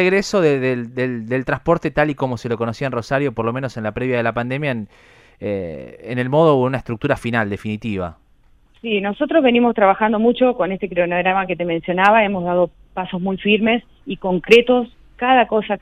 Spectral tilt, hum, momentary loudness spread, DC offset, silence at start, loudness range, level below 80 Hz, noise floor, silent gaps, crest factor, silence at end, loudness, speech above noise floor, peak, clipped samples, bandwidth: -6.5 dB/octave; none; 12 LU; under 0.1%; 0 s; 5 LU; -48 dBFS; -53 dBFS; none; 18 dB; 0.05 s; -18 LUFS; 35 dB; 0 dBFS; under 0.1%; 12 kHz